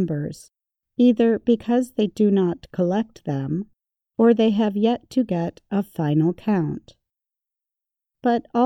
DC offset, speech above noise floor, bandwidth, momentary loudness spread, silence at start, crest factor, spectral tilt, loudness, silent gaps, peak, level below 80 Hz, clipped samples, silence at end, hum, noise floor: under 0.1%; 67 dB; 12.5 kHz; 11 LU; 0 s; 16 dB; -8 dB/octave; -22 LUFS; none; -6 dBFS; -58 dBFS; under 0.1%; 0 s; none; -87 dBFS